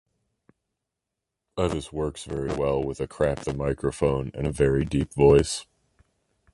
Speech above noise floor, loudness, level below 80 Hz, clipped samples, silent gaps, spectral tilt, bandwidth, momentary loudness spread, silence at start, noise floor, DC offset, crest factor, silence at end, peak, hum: 61 dB; -25 LUFS; -40 dBFS; under 0.1%; none; -6 dB/octave; 11.5 kHz; 12 LU; 1.55 s; -85 dBFS; under 0.1%; 20 dB; 0.9 s; -6 dBFS; none